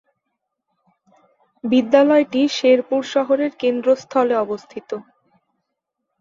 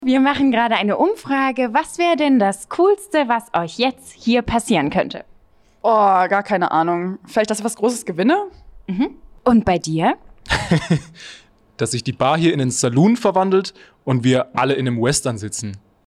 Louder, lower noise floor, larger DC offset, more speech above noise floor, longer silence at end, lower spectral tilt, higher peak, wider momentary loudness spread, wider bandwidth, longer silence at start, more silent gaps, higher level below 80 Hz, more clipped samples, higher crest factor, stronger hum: about the same, -18 LUFS vs -18 LUFS; first, -78 dBFS vs -52 dBFS; neither; first, 61 dB vs 35 dB; first, 1.2 s vs 0.3 s; about the same, -4.5 dB/octave vs -5 dB/octave; about the same, -2 dBFS vs -4 dBFS; first, 17 LU vs 11 LU; second, 7.6 kHz vs 13.5 kHz; first, 1.65 s vs 0 s; neither; second, -68 dBFS vs -46 dBFS; neither; about the same, 18 dB vs 14 dB; neither